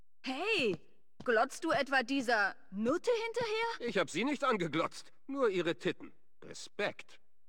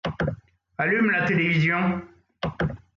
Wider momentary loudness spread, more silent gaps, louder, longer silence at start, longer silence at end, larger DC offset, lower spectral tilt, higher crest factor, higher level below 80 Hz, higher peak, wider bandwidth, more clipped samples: about the same, 12 LU vs 13 LU; neither; second, -34 LUFS vs -24 LUFS; first, 0.25 s vs 0.05 s; first, 0.35 s vs 0.2 s; first, 0.3% vs under 0.1%; second, -4 dB/octave vs -7.5 dB/octave; about the same, 18 dB vs 14 dB; second, -74 dBFS vs -48 dBFS; second, -16 dBFS vs -12 dBFS; first, 17 kHz vs 7.2 kHz; neither